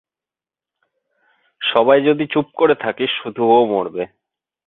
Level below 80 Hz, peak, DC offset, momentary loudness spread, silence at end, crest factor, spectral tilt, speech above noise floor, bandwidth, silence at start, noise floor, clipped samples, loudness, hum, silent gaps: -64 dBFS; 0 dBFS; under 0.1%; 10 LU; 0.6 s; 18 dB; -9 dB/octave; 74 dB; 4.1 kHz; 1.6 s; -90 dBFS; under 0.1%; -17 LUFS; none; none